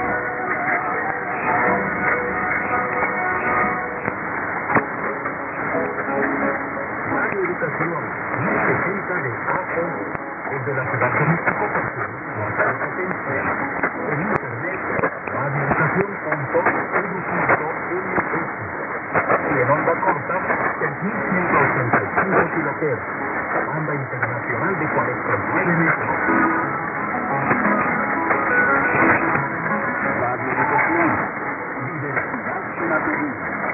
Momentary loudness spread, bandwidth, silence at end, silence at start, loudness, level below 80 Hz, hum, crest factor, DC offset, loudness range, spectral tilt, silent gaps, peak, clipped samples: 7 LU; 2.9 kHz; 0 s; 0 s; -21 LUFS; -52 dBFS; none; 22 dB; under 0.1%; 4 LU; -13 dB/octave; none; 0 dBFS; under 0.1%